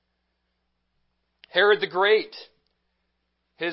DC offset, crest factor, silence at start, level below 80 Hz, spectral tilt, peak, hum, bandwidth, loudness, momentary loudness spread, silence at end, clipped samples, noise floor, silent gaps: under 0.1%; 22 dB; 1.55 s; -78 dBFS; -7.5 dB/octave; -4 dBFS; none; 5.8 kHz; -22 LUFS; 11 LU; 0 s; under 0.1%; -76 dBFS; none